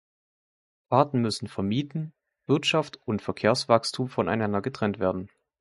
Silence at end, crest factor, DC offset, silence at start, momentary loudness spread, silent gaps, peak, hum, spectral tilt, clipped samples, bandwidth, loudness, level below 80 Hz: 0.35 s; 24 dB; under 0.1%; 0.9 s; 12 LU; none; -4 dBFS; none; -5.5 dB/octave; under 0.1%; 11.5 kHz; -26 LUFS; -58 dBFS